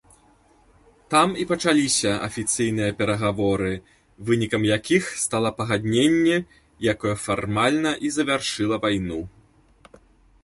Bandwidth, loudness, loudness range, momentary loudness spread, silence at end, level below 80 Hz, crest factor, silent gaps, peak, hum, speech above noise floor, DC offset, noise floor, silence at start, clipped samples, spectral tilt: 11.5 kHz; -22 LUFS; 2 LU; 7 LU; 1.15 s; -50 dBFS; 18 dB; none; -4 dBFS; none; 35 dB; under 0.1%; -57 dBFS; 1.1 s; under 0.1%; -4 dB/octave